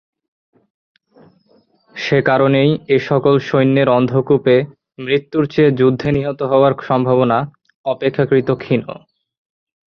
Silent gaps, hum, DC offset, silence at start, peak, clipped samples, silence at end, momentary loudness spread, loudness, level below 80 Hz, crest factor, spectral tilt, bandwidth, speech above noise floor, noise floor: 7.75-7.84 s; none; under 0.1%; 1.95 s; -2 dBFS; under 0.1%; 0.95 s; 12 LU; -15 LUFS; -50 dBFS; 14 dB; -8 dB/octave; 6.6 kHz; 41 dB; -56 dBFS